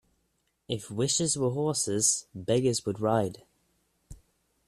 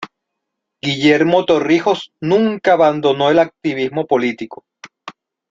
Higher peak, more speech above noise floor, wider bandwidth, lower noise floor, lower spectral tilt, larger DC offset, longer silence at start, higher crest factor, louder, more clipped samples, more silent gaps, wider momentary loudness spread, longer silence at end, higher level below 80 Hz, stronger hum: second, -10 dBFS vs -2 dBFS; second, 47 dB vs 63 dB; first, 14 kHz vs 7.6 kHz; about the same, -75 dBFS vs -77 dBFS; second, -4 dB/octave vs -6 dB/octave; neither; first, 0.7 s vs 0 s; first, 20 dB vs 14 dB; second, -28 LUFS vs -15 LUFS; neither; neither; second, 10 LU vs 15 LU; about the same, 0.5 s vs 0.4 s; about the same, -60 dBFS vs -58 dBFS; neither